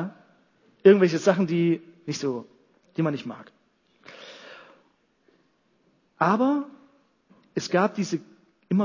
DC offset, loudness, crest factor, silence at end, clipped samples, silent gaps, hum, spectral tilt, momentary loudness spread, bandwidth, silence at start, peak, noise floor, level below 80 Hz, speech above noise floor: under 0.1%; -24 LUFS; 22 dB; 0 s; under 0.1%; none; none; -6.5 dB/octave; 25 LU; 7.4 kHz; 0 s; -4 dBFS; -67 dBFS; -76 dBFS; 44 dB